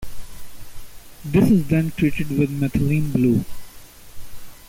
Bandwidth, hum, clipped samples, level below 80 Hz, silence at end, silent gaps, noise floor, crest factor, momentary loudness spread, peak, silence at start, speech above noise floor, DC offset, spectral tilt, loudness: 17 kHz; none; under 0.1%; -40 dBFS; 0.05 s; none; -40 dBFS; 16 dB; 20 LU; -6 dBFS; 0 s; 22 dB; under 0.1%; -7.5 dB/octave; -20 LUFS